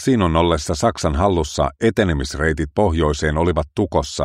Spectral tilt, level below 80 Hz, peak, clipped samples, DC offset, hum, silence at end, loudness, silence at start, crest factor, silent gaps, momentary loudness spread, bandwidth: -5.5 dB/octave; -30 dBFS; -2 dBFS; under 0.1%; under 0.1%; none; 0 s; -19 LUFS; 0 s; 16 dB; none; 4 LU; 13 kHz